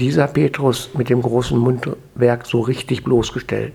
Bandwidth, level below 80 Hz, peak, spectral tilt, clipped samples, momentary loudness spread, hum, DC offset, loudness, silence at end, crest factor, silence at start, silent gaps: 15 kHz; -42 dBFS; 0 dBFS; -6.5 dB/octave; under 0.1%; 6 LU; none; under 0.1%; -18 LUFS; 0 s; 16 dB; 0 s; none